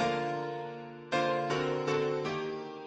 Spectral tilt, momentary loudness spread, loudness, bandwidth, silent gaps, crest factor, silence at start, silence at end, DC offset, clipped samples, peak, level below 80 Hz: -5.5 dB/octave; 9 LU; -33 LUFS; 9 kHz; none; 16 dB; 0 s; 0 s; under 0.1%; under 0.1%; -16 dBFS; -68 dBFS